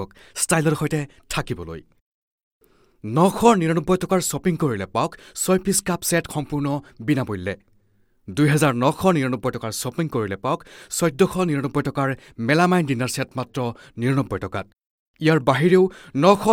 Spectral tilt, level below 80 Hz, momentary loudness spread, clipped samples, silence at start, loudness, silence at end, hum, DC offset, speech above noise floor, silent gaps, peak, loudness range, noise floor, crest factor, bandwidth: -5.5 dB/octave; -50 dBFS; 12 LU; under 0.1%; 0 s; -22 LUFS; 0 s; none; under 0.1%; 40 dB; 2.01-2.61 s, 14.90-15.14 s; 0 dBFS; 3 LU; -61 dBFS; 20 dB; 17.5 kHz